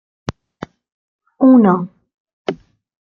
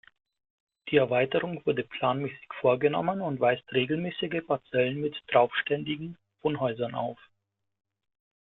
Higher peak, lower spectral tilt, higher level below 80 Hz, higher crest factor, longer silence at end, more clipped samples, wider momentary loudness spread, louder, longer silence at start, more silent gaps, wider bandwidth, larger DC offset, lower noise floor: first, -2 dBFS vs -8 dBFS; about the same, -8.5 dB/octave vs -9.5 dB/octave; first, -52 dBFS vs -68 dBFS; about the same, 16 dB vs 20 dB; second, 0.45 s vs 1.3 s; neither; first, 25 LU vs 10 LU; first, -14 LUFS vs -28 LUFS; first, 1.4 s vs 0.85 s; first, 2.14-2.25 s, 2.33-2.45 s vs none; first, 6.6 kHz vs 4.2 kHz; neither; second, -36 dBFS vs -79 dBFS